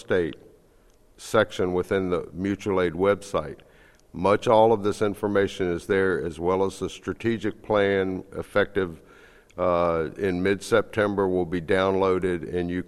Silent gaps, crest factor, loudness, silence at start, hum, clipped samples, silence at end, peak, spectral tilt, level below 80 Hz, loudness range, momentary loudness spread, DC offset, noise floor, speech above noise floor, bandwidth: none; 20 dB; -25 LUFS; 0.1 s; none; under 0.1%; 0.05 s; -4 dBFS; -6 dB/octave; -52 dBFS; 3 LU; 8 LU; under 0.1%; -57 dBFS; 33 dB; 13 kHz